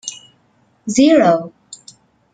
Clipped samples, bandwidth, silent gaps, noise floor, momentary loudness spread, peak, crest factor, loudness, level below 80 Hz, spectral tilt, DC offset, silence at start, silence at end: under 0.1%; 9.4 kHz; none; -58 dBFS; 21 LU; -2 dBFS; 16 dB; -13 LUFS; -58 dBFS; -4.5 dB/octave; under 0.1%; 0.05 s; 0.6 s